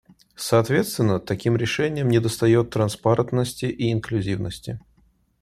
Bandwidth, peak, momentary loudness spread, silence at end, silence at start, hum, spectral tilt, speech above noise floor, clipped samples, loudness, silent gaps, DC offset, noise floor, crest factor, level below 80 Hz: 14.5 kHz; -4 dBFS; 10 LU; 0.6 s; 0.4 s; none; -6 dB/octave; 40 dB; under 0.1%; -22 LUFS; none; under 0.1%; -61 dBFS; 18 dB; -52 dBFS